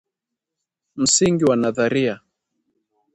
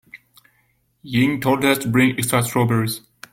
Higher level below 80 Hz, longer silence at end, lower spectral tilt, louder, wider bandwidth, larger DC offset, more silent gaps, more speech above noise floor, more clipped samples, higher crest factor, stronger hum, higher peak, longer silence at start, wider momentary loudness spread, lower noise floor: about the same, -58 dBFS vs -54 dBFS; first, 1 s vs 0.35 s; second, -3.5 dB/octave vs -5 dB/octave; about the same, -18 LUFS vs -19 LUFS; second, 11.5 kHz vs 17 kHz; neither; neither; first, 65 dB vs 45 dB; neither; about the same, 20 dB vs 16 dB; neither; about the same, -2 dBFS vs -4 dBFS; first, 0.95 s vs 0.15 s; about the same, 8 LU vs 7 LU; first, -84 dBFS vs -64 dBFS